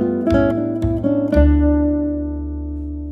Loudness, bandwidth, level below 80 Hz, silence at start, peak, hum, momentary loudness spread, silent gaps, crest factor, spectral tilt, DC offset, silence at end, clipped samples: -18 LUFS; 5.4 kHz; -24 dBFS; 0 s; -2 dBFS; none; 12 LU; none; 16 dB; -10 dB/octave; under 0.1%; 0 s; under 0.1%